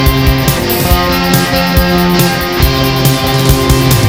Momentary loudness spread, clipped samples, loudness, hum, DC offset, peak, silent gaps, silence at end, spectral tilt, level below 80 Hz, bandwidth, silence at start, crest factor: 2 LU; 0.4%; -10 LUFS; none; 1%; 0 dBFS; none; 0 s; -5 dB/octave; -18 dBFS; 18 kHz; 0 s; 10 dB